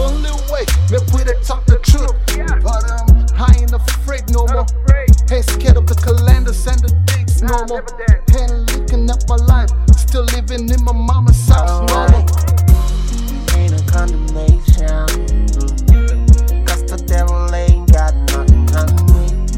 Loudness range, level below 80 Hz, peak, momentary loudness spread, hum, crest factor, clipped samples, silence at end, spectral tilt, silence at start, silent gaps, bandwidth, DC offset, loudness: 2 LU; -12 dBFS; 0 dBFS; 6 LU; none; 10 dB; 0.8%; 0 s; -6 dB/octave; 0 s; none; 16.5 kHz; under 0.1%; -14 LUFS